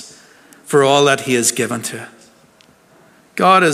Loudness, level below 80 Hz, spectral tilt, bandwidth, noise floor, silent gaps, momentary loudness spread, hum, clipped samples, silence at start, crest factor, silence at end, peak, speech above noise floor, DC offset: -15 LUFS; -66 dBFS; -3.5 dB/octave; 16 kHz; -50 dBFS; none; 19 LU; none; under 0.1%; 0 s; 16 dB; 0 s; 0 dBFS; 36 dB; under 0.1%